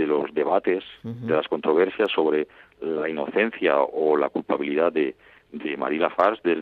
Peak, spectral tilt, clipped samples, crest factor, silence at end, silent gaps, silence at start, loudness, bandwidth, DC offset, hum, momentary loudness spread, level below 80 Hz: -6 dBFS; -7.5 dB/octave; under 0.1%; 18 dB; 0 s; none; 0 s; -23 LUFS; 4.7 kHz; under 0.1%; none; 10 LU; -68 dBFS